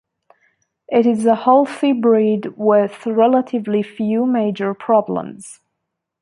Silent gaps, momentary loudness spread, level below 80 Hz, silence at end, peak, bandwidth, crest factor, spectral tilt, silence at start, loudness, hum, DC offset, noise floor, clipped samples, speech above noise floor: none; 7 LU; -68 dBFS; 0.7 s; -2 dBFS; 11.5 kHz; 16 dB; -7 dB/octave; 0.9 s; -17 LUFS; none; under 0.1%; -77 dBFS; under 0.1%; 61 dB